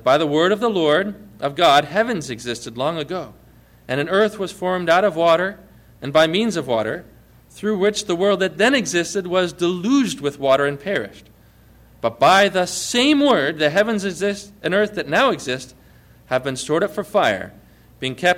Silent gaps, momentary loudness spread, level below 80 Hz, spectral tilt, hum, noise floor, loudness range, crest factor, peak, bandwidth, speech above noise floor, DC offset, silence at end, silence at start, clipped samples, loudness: none; 12 LU; -54 dBFS; -4 dB/octave; none; -50 dBFS; 4 LU; 14 dB; -4 dBFS; 16.5 kHz; 31 dB; under 0.1%; 0 s; 0.05 s; under 0.1%; -19 LUFS